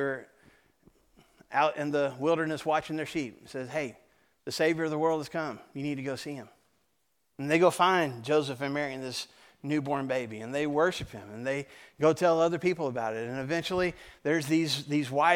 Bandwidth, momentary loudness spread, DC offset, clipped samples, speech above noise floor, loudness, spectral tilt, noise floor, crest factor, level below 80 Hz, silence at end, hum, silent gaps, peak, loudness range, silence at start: 17 kHz; 13 LU; under 0.1%; under 0.1%; 48 dB; -30 LUFS; -5 dB/octave; -77 dBFS; 22 dB; -64 dBFS; 0 s; none; none; -8 dBFS; 4 LU; 0 s